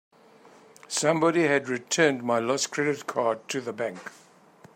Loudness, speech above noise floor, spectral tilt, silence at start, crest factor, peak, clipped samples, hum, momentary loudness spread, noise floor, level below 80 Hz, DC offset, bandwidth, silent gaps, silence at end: -26 LUFS; 29 dB; -3.5 dB/octave; 0.9 s; 20 dB; -8 dBFS; under 0.1%; none; 10 LU; -54 dBFS; -76 dBFS; under 0.1%; 16 kHz; none; 0.65 s